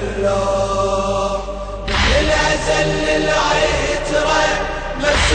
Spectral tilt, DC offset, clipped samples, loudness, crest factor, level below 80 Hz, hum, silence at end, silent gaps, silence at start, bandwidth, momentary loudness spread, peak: -3.5 dB/octave; under 0.1%; under 0.1%; -17 LUFS; 14 dB; -26 dBFS; none; 0 s; none; 0 s; 9.4 kHz; 6 LU; -4 dBFS